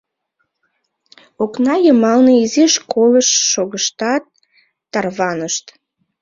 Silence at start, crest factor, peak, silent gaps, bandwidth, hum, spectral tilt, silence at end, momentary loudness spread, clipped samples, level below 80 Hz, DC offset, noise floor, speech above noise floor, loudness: 1.4 s; 14 dB; -2 dBFS; none; 7.6 kHz; none; -2.5 dB/octave; 0.6 s; 11 LU; under 0.1%; -62 dBFS; under 0.1%; -70 dBFS; 56 dB; -14 LUFS